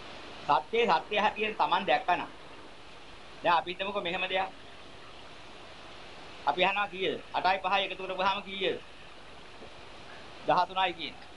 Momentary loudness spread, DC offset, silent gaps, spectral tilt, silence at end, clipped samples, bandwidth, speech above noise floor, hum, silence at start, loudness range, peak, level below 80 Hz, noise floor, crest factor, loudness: 22 LU; 0.3%; none; -4 dB/octave; 0 s; under 0.1%; 11.5 kHz; 21 dB; none; 0 s; 4 LU; -12 dBFS; -62 dBFS; -50 dBFS; 20 dB; -30 LUFS